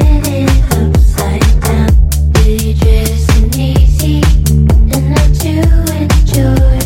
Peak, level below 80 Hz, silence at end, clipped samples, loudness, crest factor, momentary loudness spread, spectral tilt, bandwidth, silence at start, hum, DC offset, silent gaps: 0 dBFS; -10 dBFS; 0 s; 0.9%; -10 LUFS; 8 dB; 2 LU; -6 dB/octave; 17 kHz; 0 s; none; under 0.1%; none